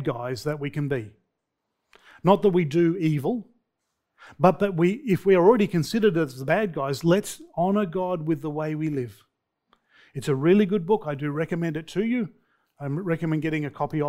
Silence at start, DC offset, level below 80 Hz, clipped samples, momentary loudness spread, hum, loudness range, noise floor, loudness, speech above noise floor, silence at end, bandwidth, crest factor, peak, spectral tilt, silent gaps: 0 s; under 0.1%; -58 dBFS; under 0.1%; 10 LU; none; 5 LU; -80 dBFS; -24 LUFS; 57 dB; 0 s; 16 kHz; 20 dB; -4 dBFS; -7 dB/octave; none